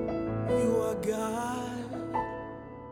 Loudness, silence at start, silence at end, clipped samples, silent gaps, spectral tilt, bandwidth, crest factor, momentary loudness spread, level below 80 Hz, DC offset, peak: -31 LUFS; 0 s; 0 s; under 0.1%; none; -6.5 dB/octave; 17 kHz; 16 dB; 12 LU; -52 dBFS; under 0.1%; -16 dBFS